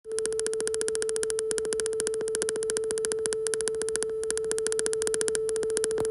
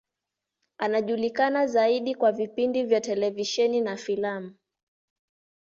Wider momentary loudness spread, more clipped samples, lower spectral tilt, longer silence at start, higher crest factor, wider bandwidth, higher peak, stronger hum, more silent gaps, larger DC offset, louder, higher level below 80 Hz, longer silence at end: second, 2 LU vs 7 LU; neither; second, -1.5 dB/octave vs -4 dB/octave; second, 0.05 s vs 0.8 s; first, 26 dB vs 18 dB; first, 12.5 kHz vs 7.6 kHz; first, -4 dBFS vs -10 dBFS; neither; neither; neither; second, -29 LUFS vs -25 LUFS; first, -60 dBFS vs -74 dBFS; second, 0 s vs 1.25 s